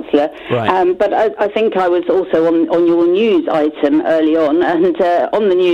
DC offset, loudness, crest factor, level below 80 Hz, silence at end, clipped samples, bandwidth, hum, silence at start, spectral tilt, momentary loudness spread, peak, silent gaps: under 0.1%; -14 LUFS; 12 dB; -52 dBFS; 0 s; under 0.1%; 6.8 kHz; none; 0 s; -7 dB/octave; 3 LU; 0 dBFS; none